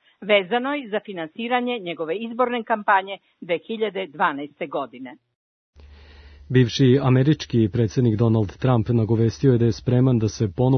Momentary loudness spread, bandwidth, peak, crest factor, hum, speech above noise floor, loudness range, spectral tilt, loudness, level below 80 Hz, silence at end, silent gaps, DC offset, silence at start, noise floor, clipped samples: 11 LU; 6.6 kHz; -4 dBFS; 16 dB; none; 25 dB; 7 LU; -7 dB/octave; -21 LUFS; -50 dBFS; 0 s; 5.35-5.73 s; under 0.1%; 0.2 s; -46 dBFS; under 0.1%